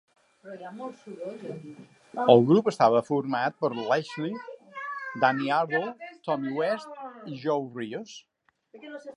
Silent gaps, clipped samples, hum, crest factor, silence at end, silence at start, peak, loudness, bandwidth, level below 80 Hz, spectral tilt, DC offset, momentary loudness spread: none; under 0.1%; none; 24 dB; 0 s; 0.45 s; -2 dBFS; -26 LUFS; 11 kHz; -78 dBFS; -6.5 dB/octave; under 0.1%; 21 LU